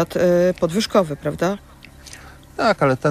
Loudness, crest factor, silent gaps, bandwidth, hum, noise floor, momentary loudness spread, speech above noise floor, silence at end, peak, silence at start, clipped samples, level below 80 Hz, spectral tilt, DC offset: -19 LUFS; 16 dB; none; 15.5 kHz; none; -41 dBFS; 22 LU; 23 dB; 0 s; -4 dBFS; 0 s; under 0.1%; -46 dBFS; -6 dB/octave; under 0.1%